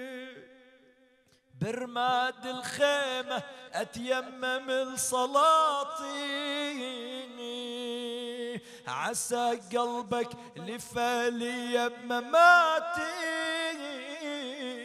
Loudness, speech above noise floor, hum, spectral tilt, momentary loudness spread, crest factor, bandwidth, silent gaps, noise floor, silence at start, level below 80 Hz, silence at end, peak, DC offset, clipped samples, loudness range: -29 LUFS; 36 dB; none; -2.5 dB/octave; 15 LU; 22 dB; 15.5 kHz; none; -65 dBFS; 0 s; -72 dBFS; 0 s; -8 dBFS; under 0.1%; under 0.1%; 7 LU